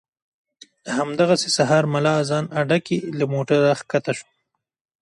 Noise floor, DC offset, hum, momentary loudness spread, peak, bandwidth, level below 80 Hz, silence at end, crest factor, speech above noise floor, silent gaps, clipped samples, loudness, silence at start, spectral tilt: -76 dBFS; under 0.1%; none; 9 LU; -4 dBFS; 11.5 kHz; -64 dBFS; 0.8 s; 18 dB; 56 dB; none; under 0.1%; -20 LUFS; 0.85 s; -5 dB/octave